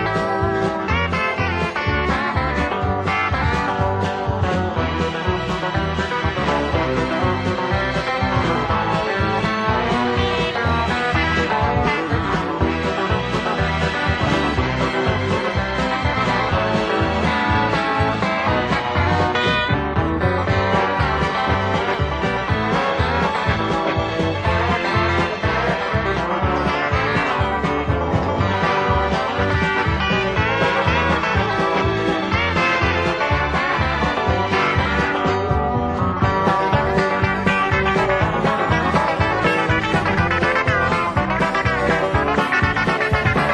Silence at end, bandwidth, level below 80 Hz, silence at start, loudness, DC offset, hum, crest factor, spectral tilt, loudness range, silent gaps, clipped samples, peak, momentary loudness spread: 0 s; 9.8 kHz; -32 dBFS; 0 s; -19 LUFS; under 0.1%; none; 16 dB; -6 dB/octave; 2 LU; none; under 0.1%; -2 dBFS; 3 LU